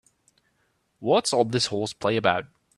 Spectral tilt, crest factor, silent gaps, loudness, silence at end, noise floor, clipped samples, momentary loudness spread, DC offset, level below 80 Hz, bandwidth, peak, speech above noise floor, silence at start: -4 dB/octave; 22 dB; none; -24 LUFS; 0.3 s; -70 dBFS; under 0.1%; 7 LU; under 0.1%; -64 dBFS; 13 kHz; -4 dBFS; 47 dB; 1 s